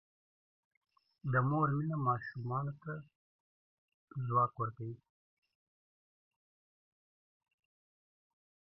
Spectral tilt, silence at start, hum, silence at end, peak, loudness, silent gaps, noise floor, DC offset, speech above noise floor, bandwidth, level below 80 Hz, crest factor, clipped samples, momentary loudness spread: -9 dB/octave; 1.25 s; none; 3.7 s; -18 dBFS; -36 LUFS; 3.15-3.88 s, 3.94-4.08 s; under -90 dBFS; under 0.1%; over 55 dB; 5.6 kHz; -76 dBFS; 22 dB; under 0.1%; 15 LU